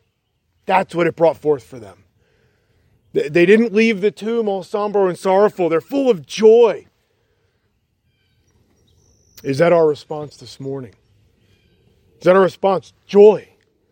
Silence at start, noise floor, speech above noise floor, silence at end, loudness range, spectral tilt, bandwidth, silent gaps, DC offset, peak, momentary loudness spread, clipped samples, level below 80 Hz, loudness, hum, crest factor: 0.7 s; -68 dBFS; 53 dB; 0.5 s; 6 LU; -6.5 dB/octave; 16.5 kHz; none; under 0.1%; 0 dBFS; 18 LU; under 0.1%; -64 dBFS; -16 LUFS; none; 18 dB